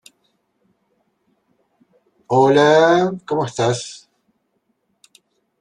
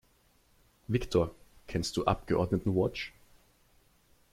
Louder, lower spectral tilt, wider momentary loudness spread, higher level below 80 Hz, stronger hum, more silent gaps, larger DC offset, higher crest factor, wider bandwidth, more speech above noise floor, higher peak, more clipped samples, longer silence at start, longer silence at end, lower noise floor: first, -16 LUFS vs -32 LUFS; about the same, -5.5 dB/octave vs -6 dB/octave; first, 15 LU vs 10 LU; second, -62 dBFS vs -50 dBFS; neither; neither; neither; about the same, 18 dB vs 22 dB; second, 10.5 kHz vs 16 kHz; first, 54 dB vs 37 dB; first, -2 dBFS vs -10 dBFS; neither; first, 2.3 s vs 0.9 s; first, 1.65 s vs 1.25 s; about the same, -69 dBFS vs -67 dBFS